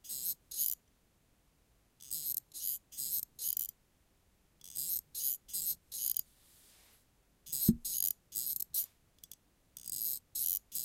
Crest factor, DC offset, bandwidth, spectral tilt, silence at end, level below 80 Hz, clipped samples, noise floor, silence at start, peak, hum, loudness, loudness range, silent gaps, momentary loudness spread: 28 dB; under 0.1%; 17 kHz; -3 dB/octave; 0 s; -64 dBFS; under 0.1%; -72 dBFS; 0.05 s; -12 dBFS; none; -36 LUFS; 3 LU; none; 10 LU